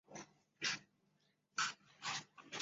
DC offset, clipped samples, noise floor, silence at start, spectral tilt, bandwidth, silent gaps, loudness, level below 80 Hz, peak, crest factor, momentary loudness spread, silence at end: under 0.1%; under 0.1%; -79 dBFS; 0.1 s; 0.5 dB/octave; 8 kHz; none; -43 LUFS; -88 dBFS; -24 dBFS; 24 dB; 15 LU; 0 s